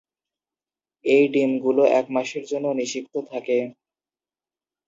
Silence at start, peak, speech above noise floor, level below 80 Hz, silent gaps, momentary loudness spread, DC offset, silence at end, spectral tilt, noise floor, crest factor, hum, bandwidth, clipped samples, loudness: 1.05 s; -6 dBFS; over 69 dB; -78 dBFS; none; 12 LU; under 0.1%; 1.15 s; -4.5 dB/octave; under -90 dBFS; 18 dB; none; 7.8 kHz; under 0.1%; -22 LUFS